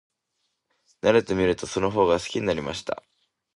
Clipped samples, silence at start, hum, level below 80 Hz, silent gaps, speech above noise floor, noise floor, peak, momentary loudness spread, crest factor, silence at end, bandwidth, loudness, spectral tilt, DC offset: under 0.1%; 1.05 s; none; -50 dBFS; none; 54 dB; -77 dBFS; -6 dBFS; 11 LU; 20 dB; 0.6 s; 11.5 kHz; -24 LUFS; -5 dB/octave; under 0.1%